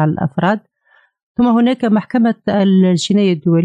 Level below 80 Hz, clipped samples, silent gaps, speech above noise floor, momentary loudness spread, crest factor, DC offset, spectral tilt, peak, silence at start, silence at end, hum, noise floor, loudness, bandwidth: -54 dBFS; under 0.1%; 1.23-1.35 s; 42 dB; 5 LU; 10 dB; under 0.1%; -7 dB/octave; -4 dBFS; 0 s; 0 s; none; -55 dBFS; -14 LUFS; 9.4 kHz